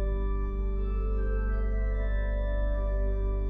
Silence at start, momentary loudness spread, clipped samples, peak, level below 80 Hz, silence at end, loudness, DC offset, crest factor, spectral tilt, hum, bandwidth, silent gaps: 0 s; 2 LU; under 0.1%; -18 dBFS; -28 dBFS; 0 s; -32 LUFS; under 0.1%; 8 dB; -10 dB/octave; 50 Hz at -35 dBFS; 3.7 kHz; none